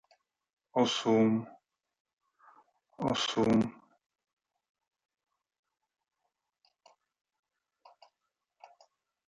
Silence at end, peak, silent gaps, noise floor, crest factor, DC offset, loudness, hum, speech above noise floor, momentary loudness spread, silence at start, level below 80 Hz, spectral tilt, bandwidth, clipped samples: 5.55 s; -14 dBFS; 2.00-2.05 s, 2.13-2.17 s; -86 dBFS; 22 dB; under 0.1%; -30 LUFS; none; 58 dB; 10 LU; 0.75 s; -70 dBFS; -5 dB/octave; 9.2 kHz; under 0.1%